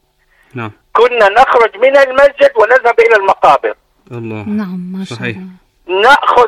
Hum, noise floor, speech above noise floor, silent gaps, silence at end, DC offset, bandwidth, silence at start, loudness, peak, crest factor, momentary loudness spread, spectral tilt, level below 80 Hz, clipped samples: none; -53 dBFS; 43 dB; none; 0 s; under 0.1%; 12.5 kHz; 0.55 s; -9 LUFS; 0 dBFS; 10 dB; 18 LU; -5 dB/octave; -46 dBFS; 0.3%